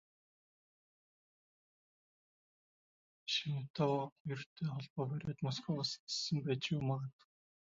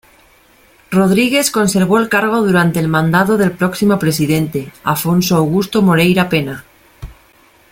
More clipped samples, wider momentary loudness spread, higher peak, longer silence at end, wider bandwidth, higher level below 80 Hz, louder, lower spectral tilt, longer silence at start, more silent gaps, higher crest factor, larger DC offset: neither; about the same, 7 LU vs 6 LU; second, -22 dBFS vs 0 dBFS; about the same, 0.65 s vs 0.6 s; second, 7.4 kHz vs 17 kHz; second, -74 dBFS vs -44 dBFS; second, -39 LUFS vs -13 LUFS; about the same, -5 dB/octave vs -5.5 dB/octave; first, 3.25 s vs 0.9 s; first, 3.70-3.74 s, 4.12-4.25 s, 4.46-4.56 s, 4.90-4.96 s, 5.99-6.07 s vs none; first, 20 dB vs 14 dB; neither